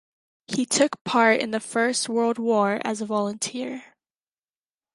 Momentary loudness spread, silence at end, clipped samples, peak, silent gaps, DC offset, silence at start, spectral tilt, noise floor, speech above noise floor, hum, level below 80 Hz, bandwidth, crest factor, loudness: 10 LU; 1.1 s; under 0.1%; -4 dBFS; 1.01-1.05 s; under 0.1%; 0.5 s; -3 dB/octave; under -90 dBFS; over 67 dB; none; -70 dBFS; 11.5 kHz; 20 dB; -23 LUFS